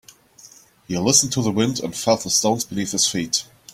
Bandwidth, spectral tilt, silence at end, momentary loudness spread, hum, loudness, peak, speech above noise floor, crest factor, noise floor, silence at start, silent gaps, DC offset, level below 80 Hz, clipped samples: 16.5 kHz; -3 dB/octave; 0.3 s; 8 LU; none; -19 LUFS; -2 dBFS; 28 dB; 20 dB; -48 dBFS; 0.45 s; none; under 0.1%; -56 dBFS; under 0.1%